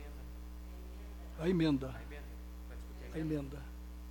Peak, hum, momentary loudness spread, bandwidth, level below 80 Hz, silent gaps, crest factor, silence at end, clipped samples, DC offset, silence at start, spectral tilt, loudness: -22 dBFS; none; 17 LU; 17.5 kHz; -48 dBFS; none; 18 dB; 0 s; under 0.1%; under 0.1%; 0 s; -7.5 dB/octave; -40 LUFS